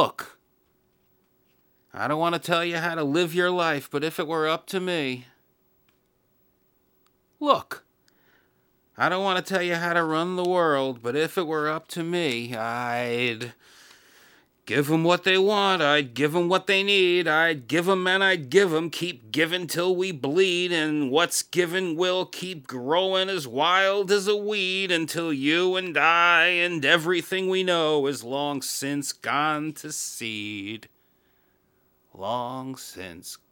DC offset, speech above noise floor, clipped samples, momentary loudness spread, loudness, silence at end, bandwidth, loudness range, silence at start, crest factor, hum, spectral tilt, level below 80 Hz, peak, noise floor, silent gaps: under 0.1%; 43 dB; under 0.1%; 12 LU; -24 LUFS; 0.15 s; 20 kHz; 10 LU; 0 s; 22 dB; none; -3.5 dB/octave; -76 dBFS; -4 dBFS; -67 dBFS; none